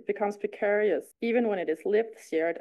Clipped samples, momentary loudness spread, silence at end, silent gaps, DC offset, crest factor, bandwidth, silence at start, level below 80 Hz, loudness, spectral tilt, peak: under 0.1%; 5 LU; 0 s; none; under 0.1%; 14 dB; 12.5 kHz; 0.1 s; -78 dBFS; -28 LUFS; -6 dB/octave; -14 dBFS